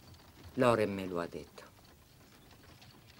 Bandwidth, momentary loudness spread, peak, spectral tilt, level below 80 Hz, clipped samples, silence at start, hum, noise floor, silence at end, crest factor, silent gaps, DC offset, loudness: 16 kHz; 27 LU; -14 dBFS; -6 dB/octave; -64 dBFS; under 0.1%; 0.05 s; none; -60 dBFS; 0.35 s; 24 dB; none; under 0.1%; -33 LUFS